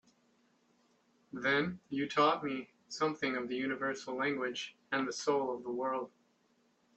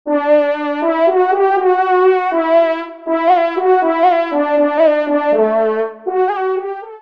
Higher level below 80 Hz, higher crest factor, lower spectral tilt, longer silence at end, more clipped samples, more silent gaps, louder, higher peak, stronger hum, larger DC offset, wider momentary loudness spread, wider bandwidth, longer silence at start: second, -76 dBFS vs -68 dBFS; first, 20 dB vs 12 dB; second, -4 dB/octave vs -6.5 dB/octave; first, 0.9 s vs 0.05 s; neither; neither; second, -35 LUFS vs -14 LUFS; second, -16 dBFS vs -2 dBFS; neither; second, under 0.1% vs 0.2%; first, 10 LU vs 7 LU; first, 8.6 kHz vs 5.6 kHz; first, 1.35 s vs 0.05 s